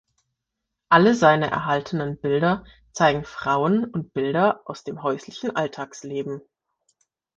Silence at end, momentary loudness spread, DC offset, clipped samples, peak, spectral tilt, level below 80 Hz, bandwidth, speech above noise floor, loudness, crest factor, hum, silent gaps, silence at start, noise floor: 1 s; 14 LU; under 0.1%; under 0.1%; -2 dBFS; -6 dB/octave; -58 dBFS; 8 kHz; 60 dB; -22 LUFS; 22 dB; none; none; 0.9 s; -82 dBFS